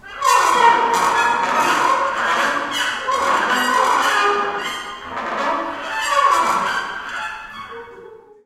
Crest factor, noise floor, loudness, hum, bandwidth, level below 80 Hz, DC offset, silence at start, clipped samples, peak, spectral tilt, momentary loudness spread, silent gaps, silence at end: 18 dB; -41 dBFS; -17 LUFS; none; 16.5 kHz; -54 dBFS; under 0.1%; 0.05 s; under 0.1%; 0 dBFS; -1 dB/octave; 13 LU; none; 0.3 s